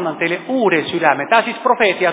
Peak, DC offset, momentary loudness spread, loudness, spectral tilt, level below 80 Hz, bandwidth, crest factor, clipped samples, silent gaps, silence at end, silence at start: 0 dBFS; under 0.1%; 5 LU; -16 LUFS; -8.5 dB/octave; -62 dBFS; 4 kHz; 16 dB; under 0.1%; none; 0 s; 0 s